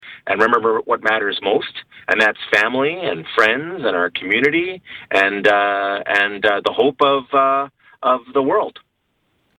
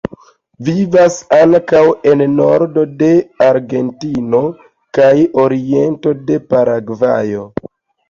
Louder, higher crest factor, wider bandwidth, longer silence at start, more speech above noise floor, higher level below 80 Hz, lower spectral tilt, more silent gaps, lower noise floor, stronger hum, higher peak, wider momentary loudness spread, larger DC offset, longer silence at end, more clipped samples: second, -17 LUFS vs -12 LUFS; about the same, 16 dB vs 12 dB; first, 11.5 kHz vs 7.6 kHz; second, 0.05 s vs 0.6 s; first, 50 dB vs 29 dB; second, -60 dBFS vs -50 dBFS; second, -4.5 dB/octave vs -7 dB/octave; neither; first, -68 dBFS vs -40 dBFS; neither; about the same, -2 dBFS vs -2 dBFS; second, 7 LU vs 11 LU; neither; first, 0.8 s vs 0.6 s; neither